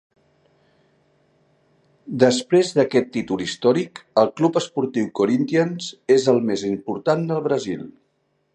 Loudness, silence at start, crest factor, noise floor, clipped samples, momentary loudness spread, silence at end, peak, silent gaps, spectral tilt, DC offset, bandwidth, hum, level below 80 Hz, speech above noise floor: -20 LUFS; 2.05 s; 20 dB; -68 dBFS; under 0.1%; 8 LU; 0.65 s; -2 dBFS; none; -5.5 dB/octave; under 0.1%; 10.5 kHz; none; -64 dBFS; 48 dB